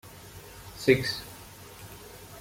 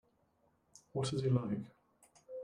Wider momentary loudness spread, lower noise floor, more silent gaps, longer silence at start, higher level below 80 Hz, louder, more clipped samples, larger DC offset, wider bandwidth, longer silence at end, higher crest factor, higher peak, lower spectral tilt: first, 22 LU vs 16 LU; second, -47 dBFS vs -75 dBFS; neither; second, 0.05 s vs 0.95 s; first, -56 dBFS vs -70 dBFS; first, -27 LUFS vs -37 LUFS; neither; neither; first, 16.5 kHz vs 10.5 kHz; about the same, 0 s vs 0 s; about the same, 24 dB vs 20 dB; first, -8 dBFS vs -20 dBFS; second, -5 dB/octave vs -7 dB/octave